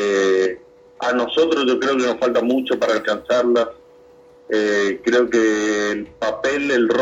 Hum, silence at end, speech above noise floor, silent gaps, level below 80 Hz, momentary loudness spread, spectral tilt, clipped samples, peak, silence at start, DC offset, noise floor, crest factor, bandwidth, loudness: none; 0 s; 29 dB; none; -58 dBFS; 7 LU; -3.5 dB/octave; under 0.1%; -6 dBFS; 0 s; under 0.1%; -47 dBFS; 14 dB; 8.2 kHz; -19 LUFS